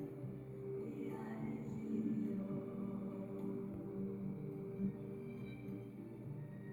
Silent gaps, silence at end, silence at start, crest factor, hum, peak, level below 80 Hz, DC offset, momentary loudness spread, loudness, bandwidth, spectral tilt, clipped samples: none; 0 s; 0 s; 16 dB; none; -28 dBFS; -70 dBFS; under 0.1%; 8 LU; -45 LUFS; 18 kHz; -10 dB/octave; under 0.1%